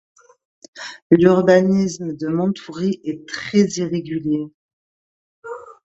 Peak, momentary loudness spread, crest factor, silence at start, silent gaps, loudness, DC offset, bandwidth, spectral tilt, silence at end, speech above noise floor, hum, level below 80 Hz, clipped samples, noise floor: 0 dBFS; 21 LU; 20 dB; 0.75 s; 1.02-1.10 s, 4.54-5.42 s; -18 LUFS; under 0.1%; 8 kHz; -6.5 dB/octave; 0.1 s; over 72 dB; none; -60 dBFS; under 0.1%; under -90 dBFS